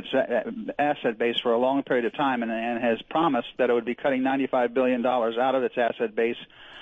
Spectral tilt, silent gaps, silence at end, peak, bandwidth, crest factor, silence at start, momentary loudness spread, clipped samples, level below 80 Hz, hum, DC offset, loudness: -7 dB/octave; none; 0 s; -12 dBFS; 7.4 kHz; 12 dB; 0 s; 4 LU; under 0.1%; -66 dBFS; none; under 0.1%; -25 LUFS